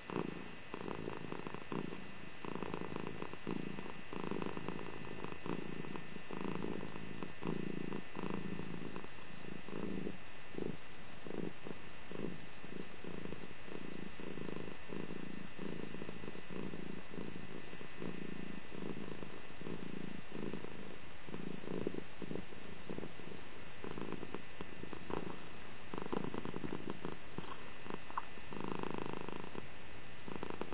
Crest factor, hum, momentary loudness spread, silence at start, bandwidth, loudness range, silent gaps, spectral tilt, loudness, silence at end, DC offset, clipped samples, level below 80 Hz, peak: 22 dB; none; 7 LU; 0 s; 4 kHz; 3 LU; none; -5 dB/octave; -47 LUFS; 0 s; 1%; under 0.1%; -64 dBFS; -22 dBFS